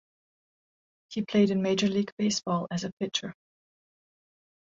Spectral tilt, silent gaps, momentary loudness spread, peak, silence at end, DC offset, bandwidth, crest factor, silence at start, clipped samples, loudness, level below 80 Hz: -5 dB/octave; 2.12-2.17 s, 2.92-2.97 s; 10 LU; -12 dBFS; 1.4 s; under 0.1%; 7.8 kHz; 18 dB; 1.1 s; under 0.1%; -28 LUFS; -70 dBFS